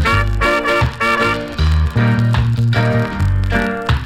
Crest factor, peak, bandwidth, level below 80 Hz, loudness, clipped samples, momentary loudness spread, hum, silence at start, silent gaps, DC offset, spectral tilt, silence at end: 12 dB; -4 dBFS; 13.5 kHz; -22 dBFS; -15 LUFS; under 0.1%; 3 LU; none; 0 s; none; under 0.1%; -6.5 dB/octave; 0 s